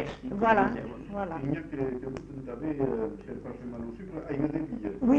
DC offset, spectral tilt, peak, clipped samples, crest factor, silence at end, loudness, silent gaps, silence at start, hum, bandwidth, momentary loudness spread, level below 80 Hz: under 0.1%; -8.5 dB/octave; -12 dBFS; under 0.1%; 20 dB; 0 s; -32 LUFS; none; 0 s; none; 8 kHz; 15 LU; -52 dBFS